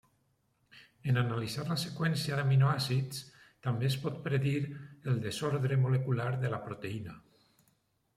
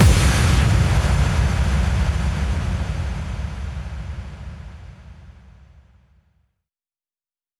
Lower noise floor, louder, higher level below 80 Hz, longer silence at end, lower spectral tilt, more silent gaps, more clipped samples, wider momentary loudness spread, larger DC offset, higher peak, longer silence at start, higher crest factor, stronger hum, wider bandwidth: second, -74 dBFS vs under -90 dBFS; second, -33 LUFS vs -21 LUFS; second, -68 dBFS vs -24 dBFS; second, 0.95 s vs 2.3 s; about the same, -6 dB/octave vs -5.5 dB/octave; neither; neither; second, 12 LU vs 20 LU; neither; second, -16 dBFS vs -2 dBFS; first, 0.75 s vs 0 s; about the same, 18 dB vs 18 dB; neither; about the same, 14.5 kHz vs 13.5 kHz